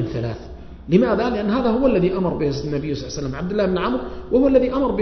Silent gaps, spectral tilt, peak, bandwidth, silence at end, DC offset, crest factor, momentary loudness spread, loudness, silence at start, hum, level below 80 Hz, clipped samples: none; -7.5 dB/octave; -2 dBFS; 6.4 kHz; 0 s; under 0.1%; 18 dB; 11 LU; -20 LUFS; 0 s; none; -38 dBFS; under 0.1%